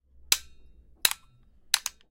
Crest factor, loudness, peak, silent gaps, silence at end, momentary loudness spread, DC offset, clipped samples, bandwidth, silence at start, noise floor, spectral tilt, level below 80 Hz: 28 dB; -27 LUFS; -4 dBFS; none; 0.2 s; 1 LU; under 0.1%; under 0.1%; 17 kHz; 0.3 s; -58 dBFS; 2.5 dB/octave; -58 dBFS